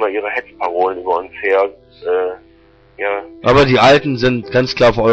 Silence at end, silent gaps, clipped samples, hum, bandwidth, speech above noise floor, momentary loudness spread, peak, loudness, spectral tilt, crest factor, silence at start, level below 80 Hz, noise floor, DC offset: 0 s; none; under 0.1%; none; 8.4 kHz; 33 dB; 12 LU; -2 dBFS; -15 LUFS; -6 dB/octave; 12 dB; 0 s; -40 dBFS; -48 dBFS; under 0.1%